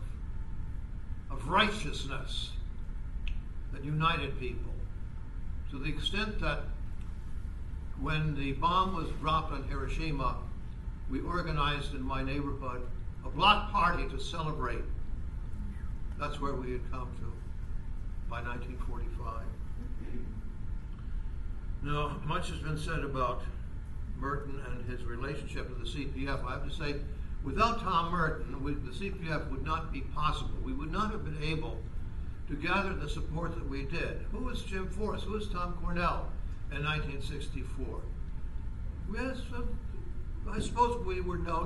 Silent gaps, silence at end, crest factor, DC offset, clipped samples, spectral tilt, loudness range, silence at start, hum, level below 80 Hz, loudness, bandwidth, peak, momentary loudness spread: none; 0 s; 24 dB; under 0.1%; under 0.1%; -5.5 dB/octave; 8 LU; 0 s; none; -38 dBFS; -36 LUFS; 11.5 kHz; -10 dBFS; 13 LU